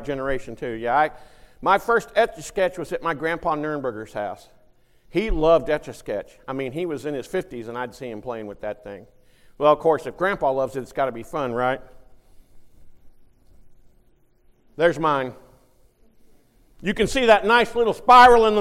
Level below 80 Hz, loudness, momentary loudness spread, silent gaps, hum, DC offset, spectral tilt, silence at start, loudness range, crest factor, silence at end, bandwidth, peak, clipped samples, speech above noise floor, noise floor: -42 dBFS; -21 LUFS; 16 LU; none; none; under 0.1%; -5 dB/octave; 0 s; 8 LU; 20 dB; 0 s; 15.5 kHz; -4 dBFS; under 0.1%; 36 dB; -57 dBFS